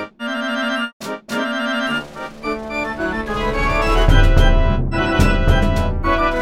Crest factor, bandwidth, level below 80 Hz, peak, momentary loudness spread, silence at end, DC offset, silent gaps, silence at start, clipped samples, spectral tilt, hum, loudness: 16 dB; 12 kHz; -20 dBFS; 0 dBFS; 10 LU; 0 s; under 0.1%; 0.93-1.00 s; 0 s; under 0.1%; -6 dB/octave; none; -19 LUFS